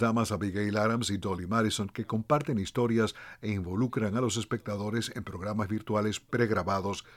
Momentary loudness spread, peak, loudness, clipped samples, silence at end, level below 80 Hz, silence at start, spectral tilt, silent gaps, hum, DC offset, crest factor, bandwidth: 6 LU; -12 dBFS; -30 LUFS; under 0.1%; 0 s; -58 dBFS; 0 s; -5.5 dB/octave; none; none; under 0.1%; 18 dB; 15.5 kHz